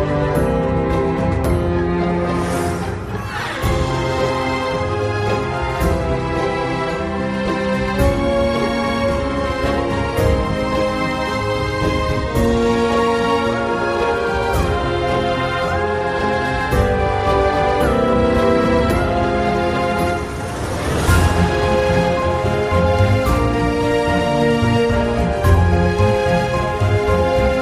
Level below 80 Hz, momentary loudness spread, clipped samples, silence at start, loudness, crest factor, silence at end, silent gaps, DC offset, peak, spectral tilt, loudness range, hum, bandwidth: -28 dBFS; 5 LU; under 0.1%; 0 s; -18 LUFS; 14 dB; 0 s; none; under 0.1%; -2 dBFS; -6.5 dB/octave; 3 LU; none; 14.5 kHz